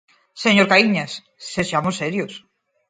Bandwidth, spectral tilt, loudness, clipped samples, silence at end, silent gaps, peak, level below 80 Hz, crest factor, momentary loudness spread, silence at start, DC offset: 9.4 kHz; -4.5 dB/octave; -18 LUFS; under 0.1%; 0.5 s; none; 0 dBFS; -58 dBFS; 20 dB; 17 LU; 0.35 s; under 0.1%